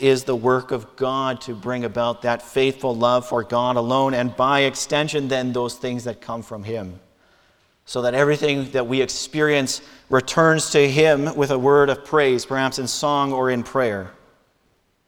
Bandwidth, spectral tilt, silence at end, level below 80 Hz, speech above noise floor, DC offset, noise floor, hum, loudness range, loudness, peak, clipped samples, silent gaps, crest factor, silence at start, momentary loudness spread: 17.5 kHz; -4.5 dB/octave; 0.95 s; -56 dBFS; 44 dB; under 0.1%; -64 dBFS; none; 6 LU; -20 LUFS; -2 dBFS; under 0.1%; none; 18 dB; 0 s; 13 LU